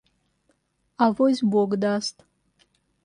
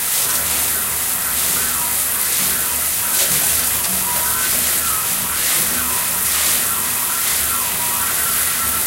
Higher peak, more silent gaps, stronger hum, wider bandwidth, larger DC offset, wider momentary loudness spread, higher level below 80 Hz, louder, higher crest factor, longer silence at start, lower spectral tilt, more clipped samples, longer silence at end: second, -8 dBFS vs 0 dBFS; neither; neither; second, 11 kHz vs 16 kHz; neither; first, 7 LU vs 2 LU; second, -68 dBFS vs -42 dBFS; second, -23 LUFS vs -15 LUFS; about the same, 18 dB vs 18 dB; first, 1 s vs 0 s; first, -6 dB/octave vs 0 dB/octave; neither; first, 0.95 s vs 0 s